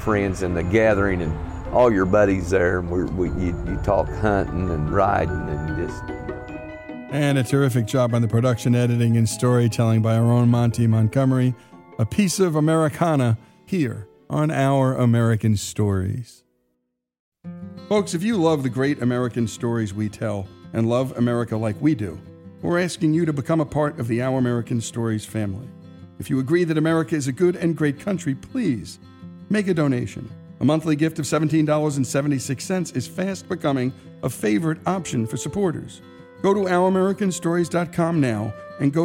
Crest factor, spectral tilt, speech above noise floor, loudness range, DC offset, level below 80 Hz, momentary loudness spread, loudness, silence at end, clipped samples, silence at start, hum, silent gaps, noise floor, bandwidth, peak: 14 dB; -6.5 dB/octave; 54 dB; 5 LU; under 0.1%; -42 dBFS; 11 LU; -22 LUFS; 0 s; under 0.1%; 0 s; none; 17.20-17.32 s; -75 dBFS; 16.5 kHz; -6 dBFS